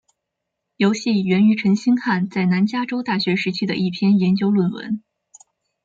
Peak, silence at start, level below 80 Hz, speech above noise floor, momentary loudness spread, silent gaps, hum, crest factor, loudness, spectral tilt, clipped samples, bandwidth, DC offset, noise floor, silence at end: -6 dBFS; 0.8 s; -64 dBFS; 61 dB; 7 LU; none; none; 14 dB; -19 LUFS; -6.5 dB/octave; under 0.1%; 7.6 kHz; under 0.1%; -80 dBFS; 0.85 s